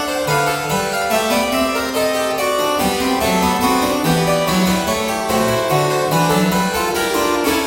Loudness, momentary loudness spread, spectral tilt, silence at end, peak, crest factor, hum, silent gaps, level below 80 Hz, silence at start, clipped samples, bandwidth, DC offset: -17 LUFS; 2 LU; -4 dB/octave; 0 s; -2 dBFS; 14 dB; none; none; -40 dBFS; 0 s; under 0.1%; 17 kHz; under 0.1%